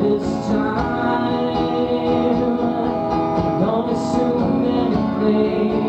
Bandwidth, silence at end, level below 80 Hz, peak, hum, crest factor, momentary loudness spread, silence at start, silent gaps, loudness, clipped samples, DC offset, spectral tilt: 8.6 kHz; 0 s; -42 dBFS; -4 dBFS; none; 14 dB; 3 LU; 0 s; none; -19 LUFS; under 0.1%; under 0.1%; -7.5 dB/octave